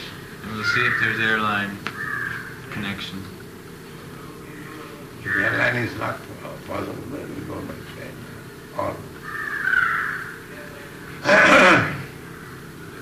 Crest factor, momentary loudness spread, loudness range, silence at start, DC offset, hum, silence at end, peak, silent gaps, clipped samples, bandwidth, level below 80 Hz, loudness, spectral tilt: 20 dB; 20 LU; 13 LU; 0 s; under 0.1%; none; 0 s; -4 dBFS; none; under 0.1%; 15.5 kHz; -54 dBFS; -21 LUFS; -4.5 dB/octave